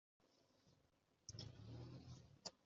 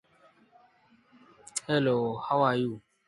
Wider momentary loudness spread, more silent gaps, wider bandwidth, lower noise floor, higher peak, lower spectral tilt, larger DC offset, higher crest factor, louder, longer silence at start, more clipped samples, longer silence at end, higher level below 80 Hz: second, 5 LU vs 10 LU; neither; second, 7.4 kHz vs 11.5 kHz; first, -81 dBFS vs -63 dBFS; second, -36 dBFS vs -12 dBFS; about the same, -5 dB/octave vs -5 dB/octave; neither; first, 26 dB vs 20 dB; second, -58 LUFS vs -28 LUFS; second, 0.2 s vs 1.55 s; neither; second, 0 s vs 0.3 s; second, -78 dBFS vs -70 dBFS